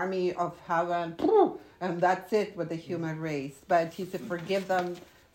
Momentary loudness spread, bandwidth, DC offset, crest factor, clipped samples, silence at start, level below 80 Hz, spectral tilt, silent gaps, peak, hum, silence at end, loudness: 11 LU; 16 kHz; under 0.1%; 18 dB; under 0.1%; 0 s; -68 dBFS; -6.5 dB/octave; none; -10 dBFS; none; 0.3 s; -30 LUFS